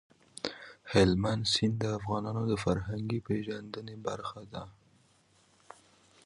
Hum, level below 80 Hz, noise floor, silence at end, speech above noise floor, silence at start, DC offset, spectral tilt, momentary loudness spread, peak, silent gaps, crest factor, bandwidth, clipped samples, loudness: none; -54 dBFS; -66 dBFS; 1.55 s; 35 dB; 0.45 s; under 0.1%; -5.5 dB/octave; 18 LU; -10 dBFS; none; 22 dB; 11.5 kHz; under 0.1%; -32 LUFS